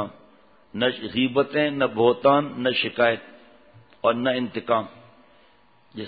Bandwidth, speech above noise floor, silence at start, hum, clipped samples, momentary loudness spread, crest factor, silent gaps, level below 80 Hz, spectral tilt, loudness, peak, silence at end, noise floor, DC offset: 4.9 kHz; 36 dB; 0 s; none; under 0.1%; 11 LU; 20 dB; none; -64 dBFS; -9.5 dB/octave; -23 LUFS; -4 dBFS; 0 s; -59 dBFS; under 0.1%